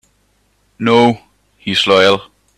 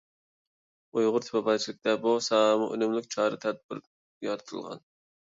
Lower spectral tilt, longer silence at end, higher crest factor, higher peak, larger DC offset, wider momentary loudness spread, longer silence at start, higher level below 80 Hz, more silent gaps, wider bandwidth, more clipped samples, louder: about the same, -4.5 dB/octave vs -4 dB/octave; about the same, 0.35 s vs 0.45 s; about the same, 16 dB vs 18 dB; first, 0 dBFS vs -12 dBFS; neither; second, 13 LU vs 16 LU; second, 0.8 s vs 0.95 s; first, -54 dBFS vs -80 dBFS; second, none vs 3.64-3.69 s, 3.87-4.21 s; first, 12.5 kHz vs 7.8 kHz; neither; first, -12 LUFS vs -28 LUFS